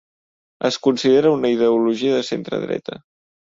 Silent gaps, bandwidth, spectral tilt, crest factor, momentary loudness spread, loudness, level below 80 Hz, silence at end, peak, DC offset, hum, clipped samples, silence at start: none; 7.8 kHz; -5.5 dB/octave; 16 dB; 11 LU; -19 LUFS; -62 dBFS; 0.65 s; -4 dBFS; under 0.1%; none; under 0.1%; 0.6 s